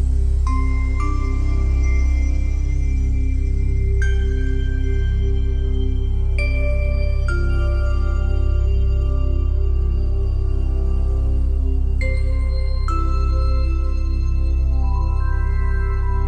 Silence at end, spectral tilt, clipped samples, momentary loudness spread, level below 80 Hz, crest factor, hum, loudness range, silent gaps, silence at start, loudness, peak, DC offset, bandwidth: 0 s; -7.5 dB/octave; under 0.1%; 2 LU; -18 dBFS; 10 dB; none; 1 LU; none; 0 s; -21 LUFS; -8 dBFS; under 0.1%; 6.6 kHz